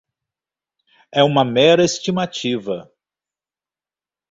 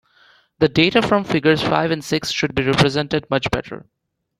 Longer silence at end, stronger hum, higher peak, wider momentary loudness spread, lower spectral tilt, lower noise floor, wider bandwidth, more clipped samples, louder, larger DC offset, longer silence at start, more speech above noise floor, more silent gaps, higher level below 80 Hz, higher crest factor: first, 1.5 s vs 0.6 s; neither; about the same, -2 dBFS vs 0 dBFS; first, 12 LU vs 8 LU; about the same, -4.5 dB/octave vs -5.5 dB/octave; first, under -90 dBFS vs -54 dBFS; second, 8 kHz vs 15 kHz; neither; about the same, -17 LUFS vs -18 LUFS; neither; first, 1.15 s vs 0.6 s; first, over 73 dB vs 36 dB; neither; second, -60 dBFS vs -44 dBFS; about the same, 20 dB vs 18 dB